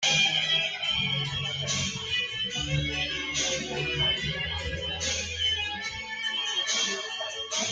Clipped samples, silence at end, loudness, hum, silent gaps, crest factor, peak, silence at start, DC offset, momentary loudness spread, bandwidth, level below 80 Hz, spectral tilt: under 0.1%; 0 s; -27 LUFS; none; none; 18 dB; -12 dBFS; 0 s; under 0.1%; 7 LU; 10 kHz; -48 dBFS; -1.5 dB/octave